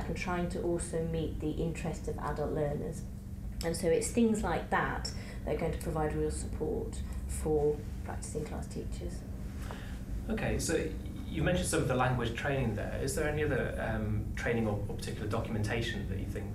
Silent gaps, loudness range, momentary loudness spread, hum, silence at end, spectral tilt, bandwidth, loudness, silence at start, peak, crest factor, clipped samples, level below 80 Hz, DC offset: none; 4 LU; 11 LU; none; 0 s; -5.5 dB/octave; 16 kHz; -34 LUFS; 0 s; -16 dBFS; 18 dB; under 0.1%; -42 dBFS; under 0.1%